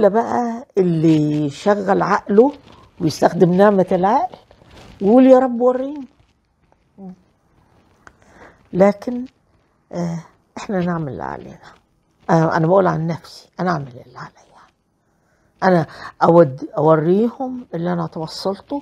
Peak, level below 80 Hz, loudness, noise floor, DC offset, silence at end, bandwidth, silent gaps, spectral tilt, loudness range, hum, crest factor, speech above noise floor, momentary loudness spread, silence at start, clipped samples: 0 dBFS; -56 dBFS; -17 LUFS; -64 dBFS; under 0.1%; 0 s; 12.5 kHz; none; -7.5 dB/octave; 9 LU; none; 18 dB; 47 dB; 18 LU; 0 s; under 0.1%